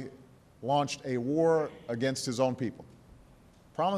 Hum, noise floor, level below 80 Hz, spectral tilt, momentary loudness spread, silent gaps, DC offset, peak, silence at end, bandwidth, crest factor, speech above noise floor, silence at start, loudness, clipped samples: none; -58 dBFS; -66 dBFS; -5.5 dB/octave; 15 LU; none; under 0.1%; -14 dBFS; 0 s; 13.5 kHz; 18 dB; 28 dB; 0 s; -31 LUFS; under 0.1%